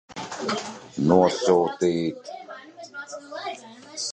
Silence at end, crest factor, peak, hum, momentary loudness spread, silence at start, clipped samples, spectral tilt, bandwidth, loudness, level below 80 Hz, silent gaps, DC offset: 0 s; 20 dB; -4 dBFS; none; 21 LU; 0.1 s; under 0.1%; -5 dB/octave; 9.6 kHz; -24 LUFS; -58 dBFS; none; under 0.1%